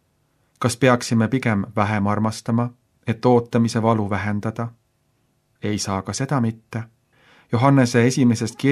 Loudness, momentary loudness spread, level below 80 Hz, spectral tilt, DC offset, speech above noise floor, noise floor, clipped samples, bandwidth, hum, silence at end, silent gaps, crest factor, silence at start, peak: -20 LUFS; 14 LU; -60 dBFS; -6 dB/octave; under 0.1%; 46 dB; -66 dBFS; under 0.1%; 13 kHz; none; 0 s; none; 20 dB; 0.6 s; -2 dBFS